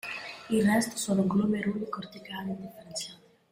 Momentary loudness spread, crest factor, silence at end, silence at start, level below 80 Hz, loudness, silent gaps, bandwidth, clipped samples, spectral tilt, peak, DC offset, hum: 14 LU; 16 dB; 0.35 s; 0.05 s; -64 dBFS; -30 LUFS; none; 16 kHz; under 0.1%; -5 dB/octave; -14 dBFS; under 0.1%; none